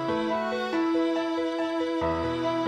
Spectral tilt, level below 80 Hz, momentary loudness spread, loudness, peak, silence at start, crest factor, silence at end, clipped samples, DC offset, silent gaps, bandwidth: -6 dB/octave; -52 dBFS; 3 LU; -27 LUFS; -16 dBFS; 0 s; 12 dB; 0 s; under 0.1%; under 0.1%; none; 9.6 kHz